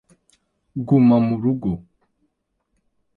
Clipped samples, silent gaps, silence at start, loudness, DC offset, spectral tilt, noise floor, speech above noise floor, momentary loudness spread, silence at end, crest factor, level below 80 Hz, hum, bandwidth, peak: under 0.1%; none; 0.75 s; -18 LUFS; under 0.1%; -11 dB/octave; -73 dBFS; 55 dB; 17 LU; 1.35 s; 16 dB; -52 dBFS; none; 4.6 kHz; -6 dBFS